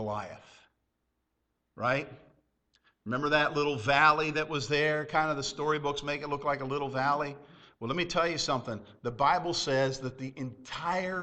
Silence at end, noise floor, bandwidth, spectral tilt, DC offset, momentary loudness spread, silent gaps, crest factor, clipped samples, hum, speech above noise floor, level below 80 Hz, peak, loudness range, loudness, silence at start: 0 s; -80 dBFS; 8.8 kHz; -4.5 dB/octave; under 0.1%; 13 LU; none; 22 dB; under 0.1%; none; 50 dB; -60 dBFS; -8 dBFS; 5 LU; -30 LUFS; 0 s